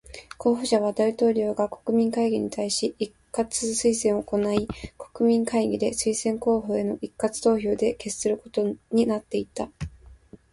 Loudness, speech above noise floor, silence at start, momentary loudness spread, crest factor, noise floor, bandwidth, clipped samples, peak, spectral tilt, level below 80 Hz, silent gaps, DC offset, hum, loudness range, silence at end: -25 LUFS; 25 dB; 0.1 s; 9 LU; 18 dB; -49 dBFS; 11.5 kHz; under 0.1%; -6 dBFS; -4.5 dB/octave; -52 dBFS; none; under 0.1%; none; 2 LU; 0.4 s